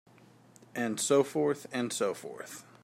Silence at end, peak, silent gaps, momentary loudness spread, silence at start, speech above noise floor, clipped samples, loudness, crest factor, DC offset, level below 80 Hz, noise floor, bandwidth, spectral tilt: 0.2 s; -14 dBFS; none; 16 LU; 0.75 s; 27 dB; under 0.1%; -31 LUFS; 20 dB; under 0.1%; -80 dBFS; -58 dBFS; 16 kHz; -4 dB/octave